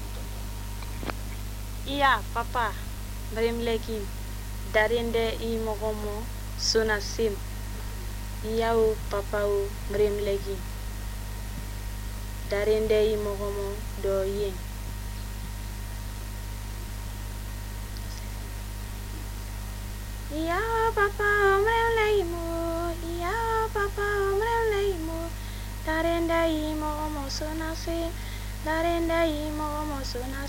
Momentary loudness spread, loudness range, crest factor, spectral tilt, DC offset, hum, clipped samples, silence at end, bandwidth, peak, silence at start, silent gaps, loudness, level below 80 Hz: 13 LU; 12 LU; 20 dB; -4.5 dB/octave; under 0.1%; 50 Hz at -35 dBFS; under 0.1%; 0 s; 16 kHz; -8 dBFS; 0 s; none; -29 LUFS; -36 dBFS